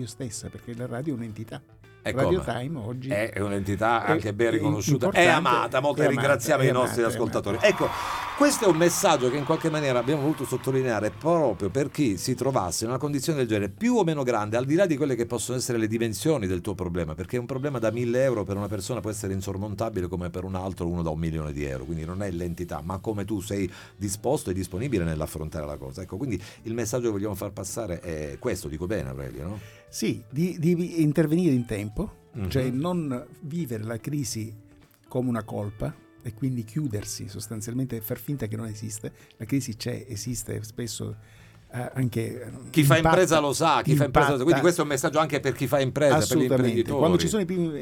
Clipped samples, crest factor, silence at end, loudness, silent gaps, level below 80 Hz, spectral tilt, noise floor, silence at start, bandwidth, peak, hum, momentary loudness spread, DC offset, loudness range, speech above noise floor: under 0.1%; 22 dB; 0 s; -26 LUFS; none; -48 dBFS; -5.5 dB/octave; -52 dBFS; 0 s; 19 kHz; -4 dBFS; none; 13 LU; under 0.1%; 10 LU; 26 dB